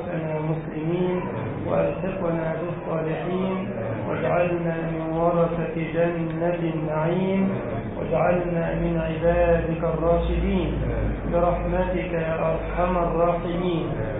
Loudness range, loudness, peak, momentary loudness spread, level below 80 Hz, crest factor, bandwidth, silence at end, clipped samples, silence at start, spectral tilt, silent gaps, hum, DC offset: 3 LU; -24 LUFS; -8 dBFS; 6 LU; -36 dBFS; 14 dB; 3.9 kHz; 0 s; under 0.1%; 0 s; -12.5 dB/octave; none; none; under 0.1%